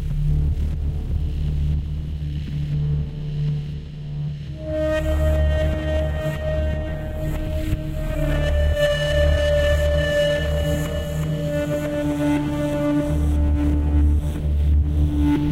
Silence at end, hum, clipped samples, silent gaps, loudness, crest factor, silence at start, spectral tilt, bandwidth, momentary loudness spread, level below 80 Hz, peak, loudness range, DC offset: 0 s; none; under 0.1%; none; -22 LUFS; 12 dB; 0 s; -7 dB/octave; 13.5 kHz; 8 LU; -24 dBFS; -8 dBFS; 5 LU; under 0.1%